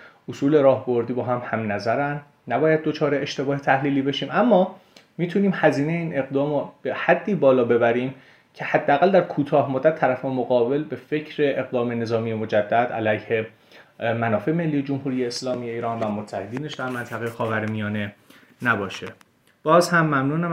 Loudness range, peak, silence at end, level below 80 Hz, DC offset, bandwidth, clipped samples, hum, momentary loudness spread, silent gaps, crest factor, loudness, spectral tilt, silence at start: 6 LU; -2 dBFS; 0 s; -66 dBFS; under 0.1%; 15 kHz; under 0.1%; none; 11 LU; none; 20 dB; -22 LUFS; -6.5 dB/octave; 0 s